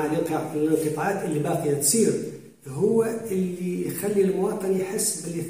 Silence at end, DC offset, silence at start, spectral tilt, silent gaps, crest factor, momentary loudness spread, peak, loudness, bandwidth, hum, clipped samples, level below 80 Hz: 0 s; 0.1%; 0 s; -5 dB/octave; none; 16 dB; 7 LU; -8 dBFS; -24 LUFS; 16 kHz; none; under 0.1%; -64 dBFS